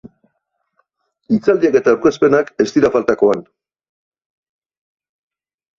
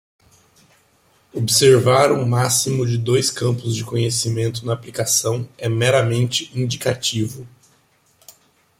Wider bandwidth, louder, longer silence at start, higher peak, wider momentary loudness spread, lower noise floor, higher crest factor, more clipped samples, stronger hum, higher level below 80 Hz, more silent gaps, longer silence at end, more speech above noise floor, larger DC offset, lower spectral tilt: second, 7.4 kHz vs 16 kHz; first, -15 LUFS vs -18 LUFS; second, 0.05 s vs 1.35 s; about the same, -2 dBFS vs -2 dBFS; second, 4 LU vs 11 LU; first, -71 dBFS vs -59 dBFS; about the same, 16 dB vs 18 dB; neither; neither; about the same, -56 dBFS vs -56 dBFS; neither; first, 2.4 s vs 1.35 s; first, 57 dB vs 41 dB; neither; first, -6.5 dB/octave vs -4 dB/octave